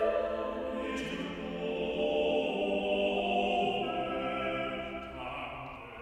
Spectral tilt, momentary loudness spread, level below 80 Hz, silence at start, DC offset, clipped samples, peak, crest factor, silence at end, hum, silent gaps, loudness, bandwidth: -5.5 dB/octave; 10 LU; -56 dBFS; 0 s; under 0.1%; under 0.1%; -18 dBFS; 14 dB; 0 s; none; none; -33 LUFS; 11 kHz